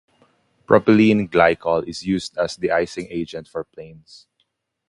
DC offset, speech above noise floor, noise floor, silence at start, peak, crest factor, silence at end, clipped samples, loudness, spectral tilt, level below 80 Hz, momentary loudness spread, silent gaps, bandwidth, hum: under 0.1%; 51 dB; -71 dBFS; 0.7 s; 0 dBFS; 20 dB; 0.95 s; under 0.1%; -19 LUFS; -6 dB/octave; -52 dBFS; 17 LU; none; 11 kHz; none